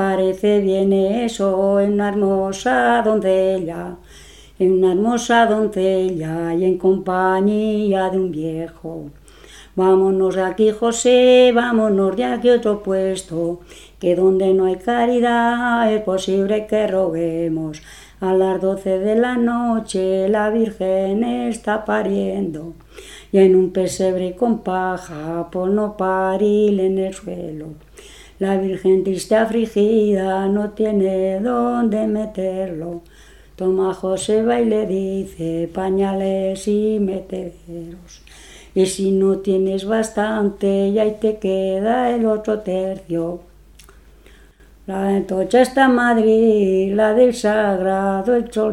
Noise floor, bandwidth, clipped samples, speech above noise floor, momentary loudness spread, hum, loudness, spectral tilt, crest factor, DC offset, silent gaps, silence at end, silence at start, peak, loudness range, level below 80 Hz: -47 dBFS; 12.5 kHz; under 0.1%; 29 dB; 11 LU; none; -18 LUFS; -6 dB/octave; 18 dB; under 0.1%; none; 0 s; 0 s; 0 dBFS; 5 LU; -48 dBFS